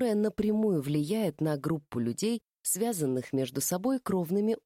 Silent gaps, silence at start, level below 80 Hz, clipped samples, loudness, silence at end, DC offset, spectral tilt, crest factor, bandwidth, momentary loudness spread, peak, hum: 2.56-2.60 s; 0 s; -64 dBFS; under 0.1%; -30 LUFS; 0.05 s; under 0.1%; -5.5 dB/octave; 12 dB; 16.5 kHz; 4 LU; -18 dBFS; none